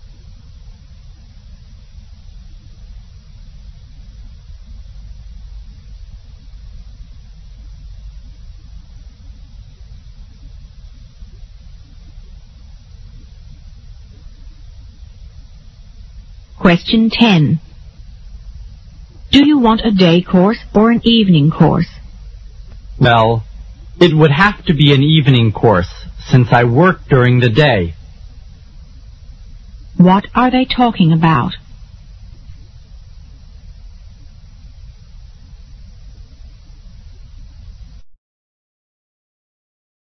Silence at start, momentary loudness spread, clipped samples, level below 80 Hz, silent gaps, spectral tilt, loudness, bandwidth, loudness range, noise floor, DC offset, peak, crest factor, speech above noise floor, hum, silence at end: 0 s; 27 LU; under 0.1%; -34 dBFS; none; -7.5 dB/octave; -11 LUFS; 7.2 kHz; 5 LU; -37 dBFS; under 0.1%; 0 dBFS; 16 dB; 27 dB; none; 1.9 s